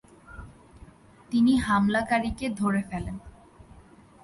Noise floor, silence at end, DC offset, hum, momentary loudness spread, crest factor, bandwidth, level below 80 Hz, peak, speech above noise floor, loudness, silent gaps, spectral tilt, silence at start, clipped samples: -53 dBFS; 0.95 s; under 0.1%; none; 24 LU; 16 dB; 11.5 kHz; -48 dBFS; -12 dBFS; 28 dB; -25 LUFS; none; -6 dB/octave; 0.3 s; under 0.1%